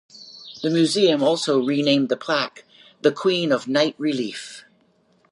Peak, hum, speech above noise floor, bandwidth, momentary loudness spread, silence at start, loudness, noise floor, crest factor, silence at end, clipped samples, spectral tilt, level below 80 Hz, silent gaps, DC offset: -4 dBFS; none; 41 dB; 11.5 kHz; 16 LU; 0.15 s; -21 LUFS; -61 dBFS; 18 dB; 0.7 s; under 0.1%; -4.5 dB/octave; -76 dBFS; none; under 0.1%